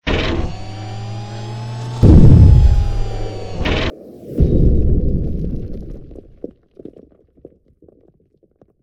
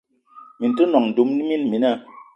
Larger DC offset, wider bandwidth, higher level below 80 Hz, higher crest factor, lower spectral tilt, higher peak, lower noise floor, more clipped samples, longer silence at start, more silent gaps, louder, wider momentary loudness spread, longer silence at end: neither; first, 8.2 kHz vs 5.8 kHz; first, -18 dBFS vs -72 dBFS; second, 14 dB vs 20 dB; about the same, -8 dB/octave vs -7.5 dB/octave; about the same, 0 dBFS vs -2 dBFS; first, -57 dBFS vs -47 dBFS; first, 0.3% vs under 0.1%; second, 0.05 s vs 0.35 s; neither; first, -15 LUFS vs -20 LUFS; first, 26 LU vs 7 LU; first, 2.6 s vs 0.15 s